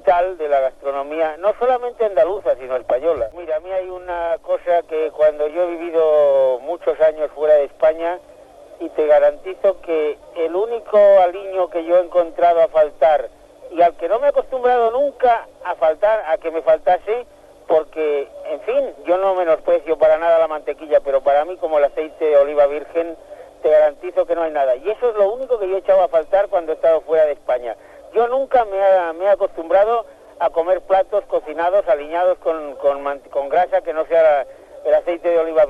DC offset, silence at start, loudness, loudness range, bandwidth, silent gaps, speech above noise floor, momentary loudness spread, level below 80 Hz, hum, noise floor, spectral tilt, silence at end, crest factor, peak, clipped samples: under 0.1%; 0.05 s; -18 LUFS; 3 LU; 5 kHz; none; 25 dB; 9 LU; -52 dBFS; none; -43 dBFS; -5.5 dB/octave; 0 s; 14 dB; -4 dBFS; under 0.1%